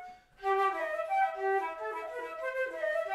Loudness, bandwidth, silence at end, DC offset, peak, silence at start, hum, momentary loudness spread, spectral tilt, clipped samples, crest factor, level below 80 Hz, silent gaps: -33 LUFS; 14.5 kHz; 0 s; under 0.1%; -18 dBFS; 0 s; none; 9 LU; -3 dB/octave; under 0.1%; 16 dB; -70 dBFS; none